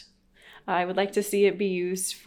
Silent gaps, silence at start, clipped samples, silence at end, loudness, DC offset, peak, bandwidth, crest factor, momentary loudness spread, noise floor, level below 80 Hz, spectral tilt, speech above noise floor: none; 0 s; under 0.1%; 0.1 s; -26 LUFS; under 0.1%; -12 dBFS; 18 kHz; 16 dB; 6 LU; -55 dBFS; -66 dBFS; -4 dB/octave; 30 dB